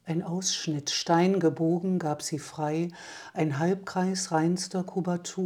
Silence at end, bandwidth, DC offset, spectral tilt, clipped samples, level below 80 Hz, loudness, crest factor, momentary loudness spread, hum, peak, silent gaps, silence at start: 0 s; 14.5 kHz; under 0.1%; -5 dB/octave; under 0.1%; -74 dBFS; -28 LUFS; 18 dB; 8 LU; none; -10 dBFS; none; 0.05 s